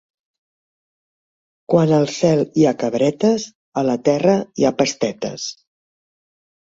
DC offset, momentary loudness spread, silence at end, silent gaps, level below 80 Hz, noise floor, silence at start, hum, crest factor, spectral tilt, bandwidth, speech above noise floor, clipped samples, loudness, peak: under 0.1%; 10 LU; 1.1 s; 3.55-3.72 s; -60 dBFS; under -90 dBFS; 1.7 s; none; 18 dB; -6 dB/octave; 7.8 kHz; over 73 dB; under 0.1%; -18 LUFS; -2 dBFS